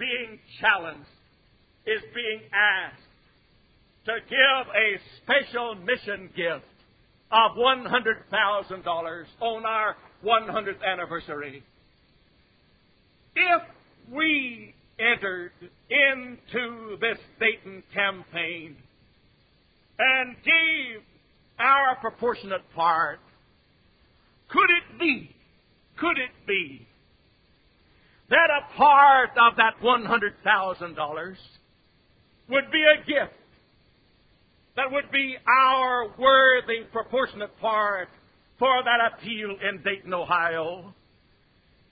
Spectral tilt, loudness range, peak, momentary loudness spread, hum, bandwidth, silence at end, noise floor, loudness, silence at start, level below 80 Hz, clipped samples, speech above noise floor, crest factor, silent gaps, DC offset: -7.5 dB/octave; 8 LU; -2 dBFS; 15 LU; none; 5 kHz; 1 s; -63 dBFS; -23 LUFS; 0 s; -64 dBFS; under 0.1%; 39 dB; 22 dB; none; under 0.1%